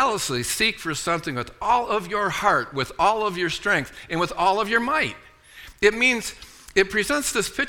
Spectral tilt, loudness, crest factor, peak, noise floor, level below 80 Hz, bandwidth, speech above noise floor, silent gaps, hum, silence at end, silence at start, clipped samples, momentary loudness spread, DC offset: -3 dB/octave; -22 LUFS; 20 dB; -2 dBFS; -46 dBFS; -48 dBFS; 18.5 kHz; 23 dB; none; none; 0 s; 0 s; under 0.1%; 8 LU; under 0.1%